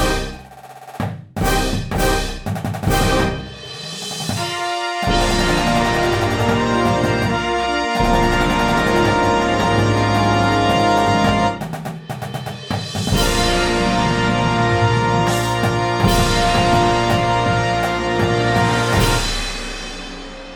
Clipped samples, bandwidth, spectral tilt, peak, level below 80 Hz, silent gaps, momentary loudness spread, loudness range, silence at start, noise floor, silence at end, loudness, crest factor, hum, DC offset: under 0.1%; 20 kHz; -5 dB/octave; -2 dBFS; -28 dBFS; none; 12 LU; 5 LU; 0 s; -38 dBFS; 0 s; -17 LUFS; 16 dB; none; under 0.1%